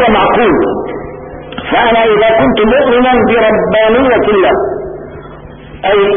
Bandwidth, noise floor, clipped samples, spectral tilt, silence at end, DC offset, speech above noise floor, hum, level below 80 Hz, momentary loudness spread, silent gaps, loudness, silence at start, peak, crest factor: 3.7 kHz; -30 dBFS; under 0.1%; -10 dB/octave; 0 s; under 0.1%; 22 dB; none; -34 dBFS; 16 LU; none; -9 LUFS; 0 s; 0 dBFS; 10 dB